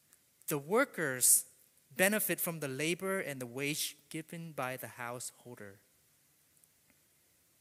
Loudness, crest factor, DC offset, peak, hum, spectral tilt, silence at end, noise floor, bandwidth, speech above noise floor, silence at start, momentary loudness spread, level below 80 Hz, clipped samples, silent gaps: -33 LUFS; 28 dB; under 0.1%; -10 dBFS; none; -2.5 dB/octave; 1.85 s; -70 dBFS; 16 kHz; 35 dB; 0.5 s; 19 LU; -84 dBFS; under 0.1%; none